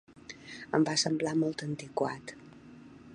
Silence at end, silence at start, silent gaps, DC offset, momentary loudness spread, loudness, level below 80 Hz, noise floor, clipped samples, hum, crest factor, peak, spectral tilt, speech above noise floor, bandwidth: 0 s; 0.15 s; none; under 0.1%; 24 LU; -31 LUFS; -70 dBFS; -52 dBFS; under 0.1%; none; 22 dB; -10 dBFS; -4 dB/octave; 21 dB; 10.5 kHz